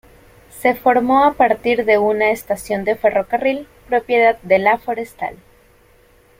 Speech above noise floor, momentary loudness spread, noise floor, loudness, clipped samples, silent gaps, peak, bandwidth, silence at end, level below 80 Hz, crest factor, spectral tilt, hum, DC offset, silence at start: 35 dB; 10 LU; -51 dBFS; -17 LUFS; under 0.1%; none; -2 dBFS; 16.5 kHz; 1.05 s; -50 dBFS; 16 dB; -5 dB/octave; none; under 0.1%; 0.55 s